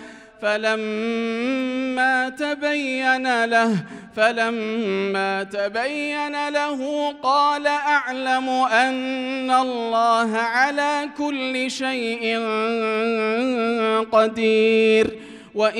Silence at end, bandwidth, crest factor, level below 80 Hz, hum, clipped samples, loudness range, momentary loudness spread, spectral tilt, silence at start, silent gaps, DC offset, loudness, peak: 0 s; 11.5 kHz; 16 dB; -64 dBFS; none; under 0.1%; 3 LU; 6 LU; -4 dB/octave; 0 s; none; under 0.1%; -21 LUFS; -4 dBFS